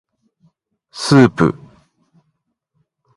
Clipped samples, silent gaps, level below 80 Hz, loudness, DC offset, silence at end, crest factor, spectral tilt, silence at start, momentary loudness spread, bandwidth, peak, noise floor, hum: under 0.1%; none; -50 dBFS; -14 LUFS; under 0.1%; 1.65 s; 20 dB; -6.5 dB/octave; 0.95 s; 23 LU; 11.5 kHz; 0 dBFS; -70 dBFS; none